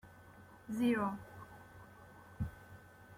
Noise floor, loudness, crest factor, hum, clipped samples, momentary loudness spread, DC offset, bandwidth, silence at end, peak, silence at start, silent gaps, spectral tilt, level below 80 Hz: -58 dBFS; -38 LUFS; 20 dB; none; under 0.1%; 24 LU; under 0.1%; 16 kHz; 0 s; -22 dBFS; 0.05 s; none; -7 dB/octave; -62 dBFS